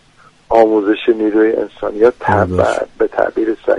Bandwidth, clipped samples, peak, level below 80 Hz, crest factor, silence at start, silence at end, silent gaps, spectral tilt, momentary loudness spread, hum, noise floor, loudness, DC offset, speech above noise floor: 10.5 kHz; under 0.1%; 0 dBFS; -44 dBFS; 14 dB; 0.5 s; 0 s; none; -7 dB/octave; 6 LU; none; -47 dBFS; -14 LUFS; under 0.1%; 34 dB